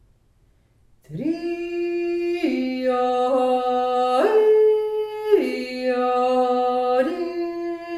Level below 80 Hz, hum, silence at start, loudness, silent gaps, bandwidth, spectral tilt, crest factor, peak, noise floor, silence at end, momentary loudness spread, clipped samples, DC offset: -60 dBFS; none; 1.1 s; -21 LUFS; none; 13.5 kHz; -5.5 dB/octave; 16 dB; -6 dBFS; -59 dBFS; 0 s; 10 LU; under 0.1%; under 0.1%